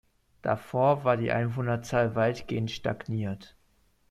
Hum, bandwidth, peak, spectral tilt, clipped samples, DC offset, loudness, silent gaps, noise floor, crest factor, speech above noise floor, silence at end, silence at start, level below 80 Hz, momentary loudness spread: none; 13 kHz; -12 dBFS; -7 dB/octave; under 0.1%; under 0.1%; -28 LUFS; none; -66 dBFS; 18 dB; 39 dB; 0.65 s; 0.45 s; -58 dBFS; 8 LU